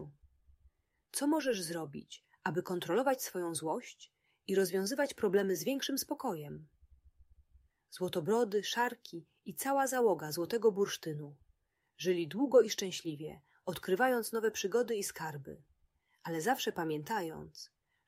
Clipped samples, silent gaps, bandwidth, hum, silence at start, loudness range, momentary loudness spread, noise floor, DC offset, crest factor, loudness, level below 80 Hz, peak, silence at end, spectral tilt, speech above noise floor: under 0.1%; none; 16 kHz; none; 0 s; 4 LU; 18 LU; -75 dBFS; under 0.1%; 20 dB; -34 LUFS; -72 dBFS; -14 dBFS; 0.4 s; -4 dB/octave; 41 dB